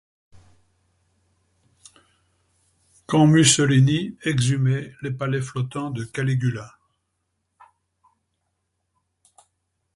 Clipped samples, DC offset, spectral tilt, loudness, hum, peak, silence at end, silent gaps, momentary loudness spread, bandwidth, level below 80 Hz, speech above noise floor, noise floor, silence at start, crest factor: under 0.1%; under 0.1%; -5 dB/octave; -21 LUFS; none; -4 dBFS; 3.25 s; none; 14 LU; 11.5 kHz; -58 dBFS; 55 dB; -75 dBFS; 3.1 s; 22 dB